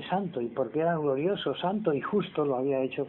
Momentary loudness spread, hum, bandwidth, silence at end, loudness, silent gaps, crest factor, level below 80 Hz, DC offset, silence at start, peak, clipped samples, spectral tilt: 3 LU; none; 4.2 kHz; 0 s; -29 LUFS; none; 14 dB; -68 dBFS; under 0.1%; 0 s; -14 dBFS; under 0.1%; -10 dB/octave